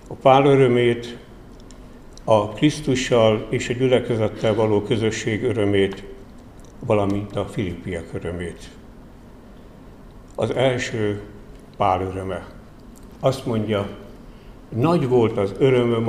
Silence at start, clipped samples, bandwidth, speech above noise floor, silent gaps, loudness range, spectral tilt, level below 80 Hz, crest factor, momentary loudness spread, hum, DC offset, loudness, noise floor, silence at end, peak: 0.05 s; under 0.1%; 13.5 kHz; 23 dB; none; 8 LU; -6.5 dB/octave; -44 dBFS; 20 dB; 16 LU; none; 0.1%; -21 LUFS; -43 dBFS; 0 s; -2 dBFS